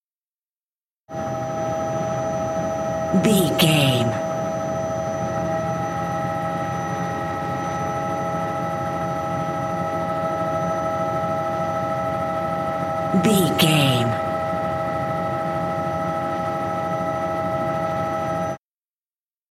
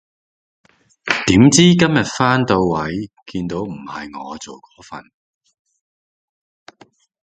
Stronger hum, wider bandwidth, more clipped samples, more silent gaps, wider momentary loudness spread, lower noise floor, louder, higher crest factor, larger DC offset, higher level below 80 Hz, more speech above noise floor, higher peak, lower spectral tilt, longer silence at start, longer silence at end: neither; first, 16.5 kHz vs 9.4 kHz; neither; neither; second, 8 LU vs 25 LU; first, under -90 dBFS vs -51 dBFS; second, -23 LUFS vs -15 LUFS; about the same, 20 dB vs 18 dB; neither; second, -54 dBFS vs -46 dBFS; first, over 73 dB vs 35 dB; second, -4 dBFS vs 0 dBFS; about the same, -5.5 dB/octave vs -4.5 dB/octave; about the same, 1.1 s vs 1.05 s; second, 0.95 s vs 2.2 s